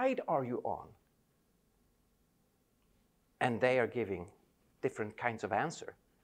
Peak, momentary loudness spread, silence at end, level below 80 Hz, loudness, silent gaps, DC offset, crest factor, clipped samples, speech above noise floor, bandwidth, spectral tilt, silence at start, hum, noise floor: -16 dBFS; 14 LU; 0.3 s; -74 dBFS; -36 LUFS; none; under 0.1%; 22 dB; under 0.1%; 39 dB; 15 kHz; -6 dB/octave; 0 s; none; -74 dBFS